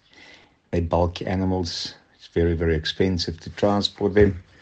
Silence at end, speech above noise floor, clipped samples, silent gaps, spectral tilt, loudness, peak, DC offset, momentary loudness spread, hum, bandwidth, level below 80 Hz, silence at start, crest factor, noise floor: 0.2 s; 29 dB; under 0.1%; none; -6 dB/octave; -23 LUFS; -4 dBFS; under 0.1%; 10 LU; none; 8.4 kHz; -38 dBFS; 0.7 s; 20 dB; -51 dBFS